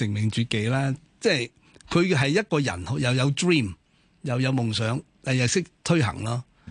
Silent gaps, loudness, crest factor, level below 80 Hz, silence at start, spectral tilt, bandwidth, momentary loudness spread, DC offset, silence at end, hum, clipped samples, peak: none; -25 LUFS; 18 dB; -50 dBFS; 0 s; -5 dB/octave; 10.5 kHz; 9 LU; under 0.1%; 0 s; none; under 0.1%; -8 dBFS